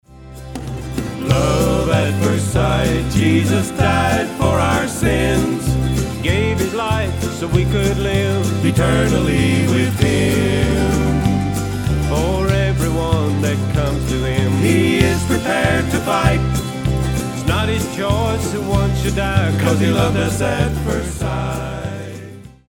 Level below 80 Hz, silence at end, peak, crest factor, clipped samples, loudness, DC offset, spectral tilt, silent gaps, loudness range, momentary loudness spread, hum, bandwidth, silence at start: -28 dBFS; 0.2 s; 0 dBFS; 16 dB; under 0.1%; -17 LUFS; under 0.1%; -6 dB/octave; none; 2 LU; 6 LU; none; 18 kHz; 0.1 s